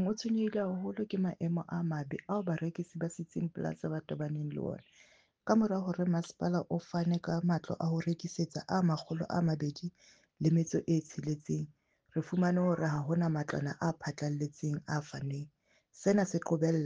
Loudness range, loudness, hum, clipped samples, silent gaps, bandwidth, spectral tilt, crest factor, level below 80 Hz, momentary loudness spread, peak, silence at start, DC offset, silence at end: 3 LU; -34 LUFS; none; under 0.1%; none; 7.6 kHz; -7 dB/octave; 18 dB; -68 dBFS; 9 LU; -14 dBFS; 0 s; under 0.1%; 0 s